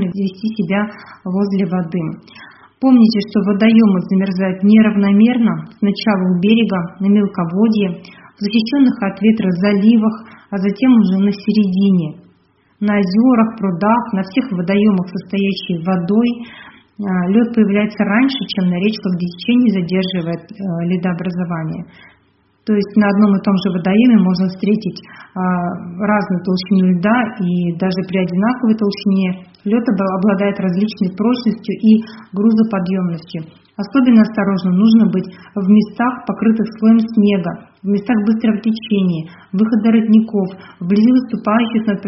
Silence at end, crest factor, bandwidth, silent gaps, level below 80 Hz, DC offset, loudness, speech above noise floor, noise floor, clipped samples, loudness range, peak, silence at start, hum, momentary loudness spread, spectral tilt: 0 s; 14 dB; 5.8 kHz; none; -56 dBFS; under 0.1%; -15 LUFS; 41 dB; -55 dBFS; under 0.1%; 4 LU; 0 dBFS; 0 s; none; 10 LU; -6.5 dB/octave